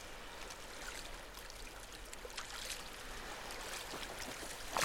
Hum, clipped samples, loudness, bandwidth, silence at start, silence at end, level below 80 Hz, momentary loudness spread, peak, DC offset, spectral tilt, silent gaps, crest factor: none; under 0.1%; -46 LUFS; 17 kHz; 0 s; 0 s; -56 dBFS; 6 LU; -20 dBFS; under 0.1%; -1.5 dB/octave; none; 26 dB